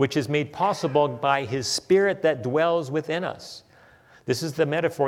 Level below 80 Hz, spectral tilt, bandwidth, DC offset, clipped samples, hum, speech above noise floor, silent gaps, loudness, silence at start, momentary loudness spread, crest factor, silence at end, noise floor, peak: -66 dBFS; -5 dB/octave; 16 kHz; under 0.1%; under 0.1%; none; 30 dB; none; -24 LUFS; 0 s; 10 LU; 18 dB; 0 s; -54 dBFS; -8 dBFS